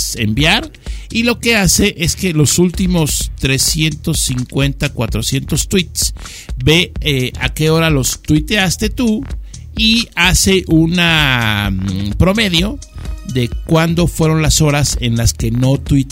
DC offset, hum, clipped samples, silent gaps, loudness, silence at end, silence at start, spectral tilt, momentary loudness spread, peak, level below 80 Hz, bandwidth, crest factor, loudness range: 0.2%; none; under 0.1%; none; -13 LUFS; 0 s; 0 s; -4 dB/octave; 8 LU; 0 dBFS; -24 dBFS; 16.5 kHz; 14 dB; 3 LU